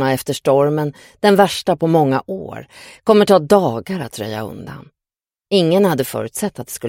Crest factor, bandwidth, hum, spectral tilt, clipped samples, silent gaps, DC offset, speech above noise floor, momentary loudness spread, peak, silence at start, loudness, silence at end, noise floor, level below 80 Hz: 16 dB; 17 kHz; none; -5.5 dB/octave; under 0.1%; none; under 0.1%; 73 dB; 16 LU; 0 dBFS; 0 s; -16 LUFS; 0 s; -90 dBFS; -54 dBFS